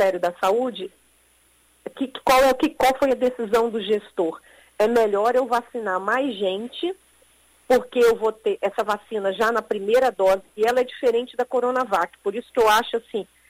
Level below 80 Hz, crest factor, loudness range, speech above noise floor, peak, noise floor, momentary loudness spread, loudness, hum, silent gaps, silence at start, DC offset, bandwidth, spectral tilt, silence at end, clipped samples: -54 dBFS; 14 dB; 2 LU; 38 dB; -8 dBFS; -59 dBFS; 11 LU; -22 LUFS; none; none; 0 s; under 0.1%; 16 kHz; -3.5 dB/octave; 0.25 s; under 0.1%